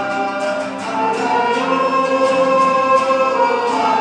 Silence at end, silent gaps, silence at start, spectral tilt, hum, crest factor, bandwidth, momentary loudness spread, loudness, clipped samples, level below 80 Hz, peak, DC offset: 0 s; none; 0 s; -4 dB/octave; none; 14 dB; 10 kHz; 6 LU; -16 LUFS; under 0.1%; -78 dBFS; -2 dBFS; under 0.1%